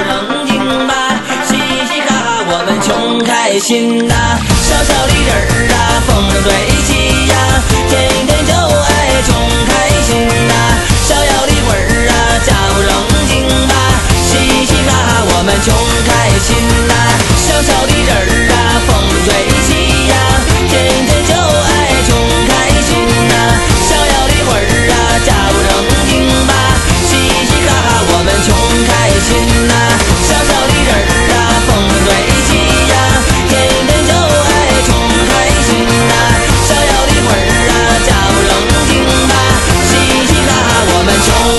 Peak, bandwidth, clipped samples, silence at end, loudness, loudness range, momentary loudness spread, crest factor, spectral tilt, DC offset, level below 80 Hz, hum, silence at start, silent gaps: 0 dBFS; 12.5 kHz; 0.3%; 0 s; -9 LUFS; 1 LU; 2 LU; 10 dB; -3.5 dB/octave; 2%; -16 dBFS; none; 0 s; none